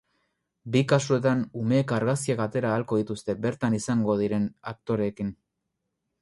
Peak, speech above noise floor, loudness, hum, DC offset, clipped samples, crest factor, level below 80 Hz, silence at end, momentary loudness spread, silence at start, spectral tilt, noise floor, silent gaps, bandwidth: -8 dBFS; 55 dB; -26 LUFS; none; under 0.1%; under 0.1%; 18 dB; -60 dBFS; 0.9 s; 8 LU; 0.65 s; -6.5 dB/octave; -81 dBFS; none; 11.5 kHz